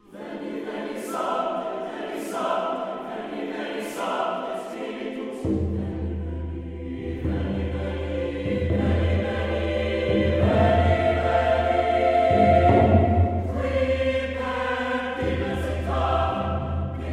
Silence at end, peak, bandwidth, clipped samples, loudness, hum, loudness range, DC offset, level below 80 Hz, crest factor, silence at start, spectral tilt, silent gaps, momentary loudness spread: 0 s; -4 dBFS; 12.5 kHz; under 0.1%; -24 LUFS; none; 9 LU; under 0.1%; -38 dBFS; 20 dB; 0.1 s; -7.5 dB/octave; none; 13 LU